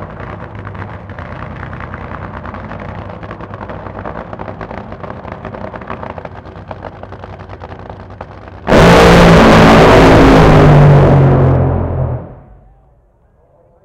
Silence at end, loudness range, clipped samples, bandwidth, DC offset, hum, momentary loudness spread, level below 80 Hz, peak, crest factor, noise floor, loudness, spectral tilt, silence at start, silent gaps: 1.5 s; 21 LU; under 0.1%; 15 kHz; under 0.1%; none; 25 LU; -22 dBFS; 0 dBFS; 12 dB; -50 dBFS; -6 LUFS; -7 dB/octave; 0 s; none